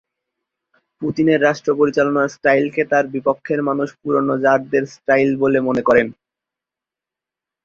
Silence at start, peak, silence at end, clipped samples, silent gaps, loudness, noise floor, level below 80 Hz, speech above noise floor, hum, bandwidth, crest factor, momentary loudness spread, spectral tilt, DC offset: 1 s; -2 dBFS; 1.55 s; under 0.1%; none; -17 LUFS; -87 dBFS; -58 dBFS; 71 dB; none; 7.2 kHz; 18 dB; 6 LU; -6.5 dB/octave; under 0.1%